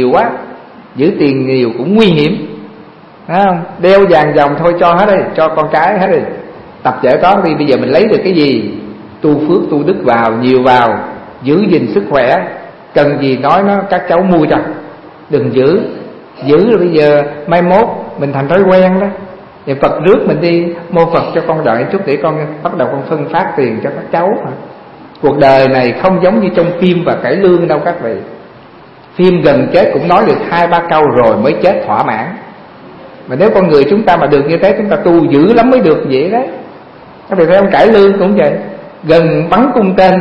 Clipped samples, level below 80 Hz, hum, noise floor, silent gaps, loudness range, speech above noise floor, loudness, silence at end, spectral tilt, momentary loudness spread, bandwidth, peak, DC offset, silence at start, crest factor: 0.5%; -42 dBFS; none; -36 dBFS; none; 3 LU; 27 dB; -10 LUFS; 0 s; -8.5 dB/octave; 13 LU; 6.8 kHz; 0 dBFS; under 0.1%; 0 s; 10 dB